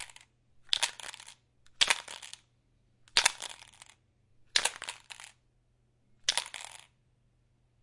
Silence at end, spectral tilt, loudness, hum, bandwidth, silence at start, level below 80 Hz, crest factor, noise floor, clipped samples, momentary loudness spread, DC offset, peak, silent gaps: 1.05 s; 2 dB/octave; -30 LUFS; none; 11.5 kHz; 0 s; -70 dBFS; 34 dB; -71 dBFS; under 0.1%; 23 LU; under 0.1%; -4 dBFS; none